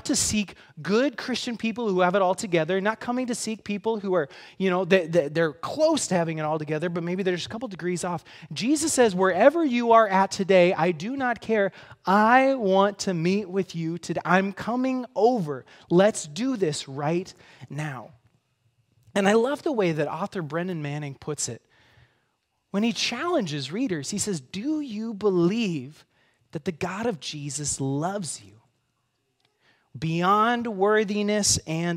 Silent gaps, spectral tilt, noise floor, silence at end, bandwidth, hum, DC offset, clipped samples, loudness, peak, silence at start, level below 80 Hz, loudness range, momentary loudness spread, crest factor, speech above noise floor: none; -4.5 dB/octave; -74 dBFS; 0 s; 16 kHz; none; under 0.1%; under 0.1%; -25 LUFS; -2 dBFS; 0.05 s; -60 dBFS; 9 LU; 13 LU; 22 dB; 50 dB